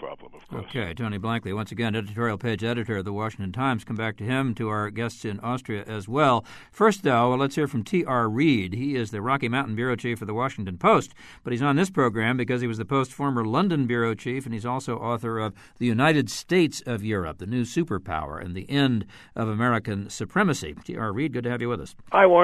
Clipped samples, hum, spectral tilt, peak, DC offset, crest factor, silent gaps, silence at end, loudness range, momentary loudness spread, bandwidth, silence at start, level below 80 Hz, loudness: under 0.1%; none; -6 dB/octave; -4 dBFS; under 0.1%; 20 dB; none; 0 s; 5 LU; 10 LU; 13.5 kHz; 0 s; -54 dBFS; -25 LUFS